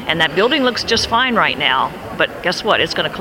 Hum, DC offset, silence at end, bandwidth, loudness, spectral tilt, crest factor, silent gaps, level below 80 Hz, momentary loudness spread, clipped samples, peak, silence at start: none; under 0.1%; 0 s; 17 kHz; -15 LUFS; -3.5 dB/octave; 16 dB; none; -44 dBFS; 5 LU; under 0.1%; 0 dBFS; 0 s